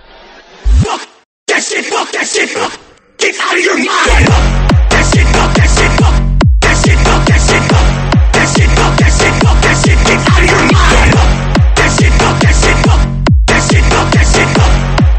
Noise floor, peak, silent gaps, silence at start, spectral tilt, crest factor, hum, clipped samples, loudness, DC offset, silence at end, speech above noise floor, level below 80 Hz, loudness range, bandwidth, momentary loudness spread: -36 dBFS; 0 dBFS; 1.25-1.46 s; 0.65 s; -4.5 dB/octave; 8 dB; none; 0.3%; -9 LUFS; under 0.1%; 0 s; 26 dB; -12 dBFS; 4 LU; 8.8 kHz; 6 LU